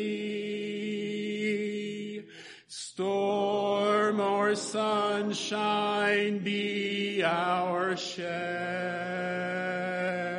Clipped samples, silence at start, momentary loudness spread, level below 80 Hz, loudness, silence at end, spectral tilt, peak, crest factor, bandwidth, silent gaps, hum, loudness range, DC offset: under 0.1%; 0 s; 8 LU; -82 dBFS; -30 LUFS; 0 s; -4.5 dB/octave; -14 dBFS; 16 dB; 10.5 kHz; none; none; 4 LU; under 0.1%